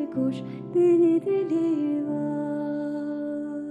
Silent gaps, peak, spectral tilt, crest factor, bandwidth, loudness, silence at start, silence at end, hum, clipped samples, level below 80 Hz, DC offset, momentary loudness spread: none; -14 dBFS; -9 dB/octave; 12 dB; 8.2 kHz; -25 LUFS; 0 s; 0 s; none; under 0.1%; -72 dBFS; under 0.1%; 11 LU